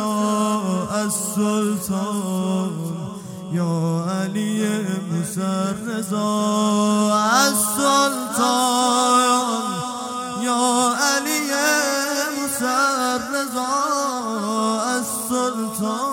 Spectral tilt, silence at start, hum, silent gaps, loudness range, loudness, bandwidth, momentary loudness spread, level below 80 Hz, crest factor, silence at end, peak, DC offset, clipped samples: -3.5 dB/octave; 0 s; none; none; 6 LU; -20 LUFS; 17 kHz; 8 LU; -64 dBFS; 18 dB; 0 s; -2 dBFS; under 0.1%; under 0.1%